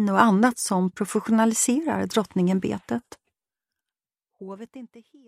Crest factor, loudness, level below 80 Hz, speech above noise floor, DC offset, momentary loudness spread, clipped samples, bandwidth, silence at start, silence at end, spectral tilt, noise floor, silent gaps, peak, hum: 22 dB; -23 LUFS; -66 dBFS; over 67 dB; under 0.1%; 21 LU; under 0.1%; 15 kHz; 0 s; 0.25 s; -5 dB/octave; under -90 dBFS; none; -2 dBFS; none